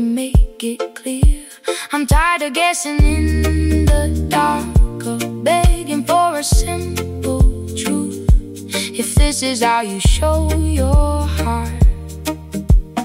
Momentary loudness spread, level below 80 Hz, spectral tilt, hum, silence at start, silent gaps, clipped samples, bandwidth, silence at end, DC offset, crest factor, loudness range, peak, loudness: 8 LU; -18 dBFS; -5 dB/octave; none; 0 s; none; under 0.1%; 16 kHz; 0 s; under 0.1%; 14 dB; 2 LU; -2 dBFS; -17 LUFS